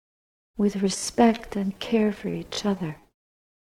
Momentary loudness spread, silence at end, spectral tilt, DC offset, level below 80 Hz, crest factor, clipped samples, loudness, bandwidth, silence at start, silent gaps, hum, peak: 12 LU; 0.75 s; -5 dB/octave; under 0.1%; -54 dBFS; 20 dB; under 0.1%; -25 LUFS; 15 kHz; 0.55 s; none; none; -6 dBFS